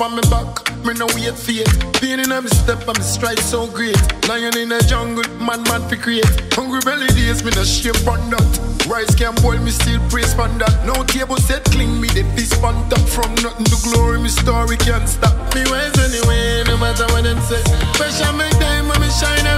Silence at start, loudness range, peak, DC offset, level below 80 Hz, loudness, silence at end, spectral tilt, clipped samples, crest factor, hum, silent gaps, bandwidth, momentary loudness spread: 0 s; 1 LU; 0 dBFS; under 0.1%; -20 dBFS; -16 LUFS; 0 s; -4 dB/octave; under 0.1%; 14 dB; none; none; 16 kHz; 3 LU